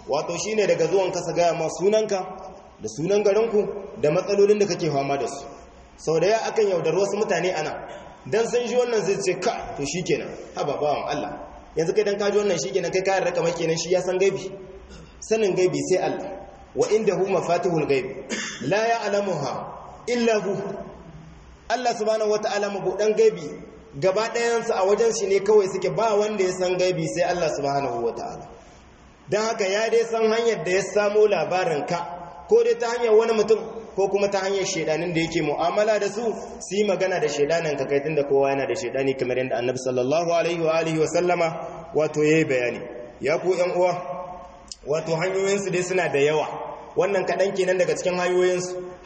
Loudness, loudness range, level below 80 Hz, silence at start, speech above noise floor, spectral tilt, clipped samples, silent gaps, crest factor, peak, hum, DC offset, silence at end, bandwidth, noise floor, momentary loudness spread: -23 LUFS; 3 LU; -56 dBFS; 0 s; 27 dB; -4.5 dB/octave; under 0.1%; none; 16 dB; -8 dBFS; none; under 0.1%; 0 s; 8.4 kHz; -49 dBFS; 13 LU